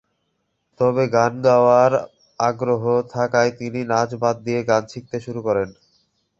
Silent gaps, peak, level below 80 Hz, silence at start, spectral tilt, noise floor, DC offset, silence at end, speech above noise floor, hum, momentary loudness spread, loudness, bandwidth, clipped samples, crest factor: none; -2 dBFS; -58 dBFS; 0.8 s; -6 dB/octave; -72 dBFS; under 0.1%; 0.7 s; 53 dB; none; 12 LU; -19 LUFS; 7.6 kHz; under 0.1%; 18 dB